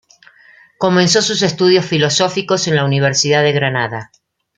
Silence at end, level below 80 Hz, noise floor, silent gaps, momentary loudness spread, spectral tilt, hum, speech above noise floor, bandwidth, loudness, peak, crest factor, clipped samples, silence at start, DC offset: 0.55 s; -56 dBFS; -47 dBFS; none; 7 LU; -4 dB/octave; none; 33 dB; 9.6 kHz; -14 LUFS; -2 dBFS; 14 dB; under 0.1%; 0.8 s; under 0.1%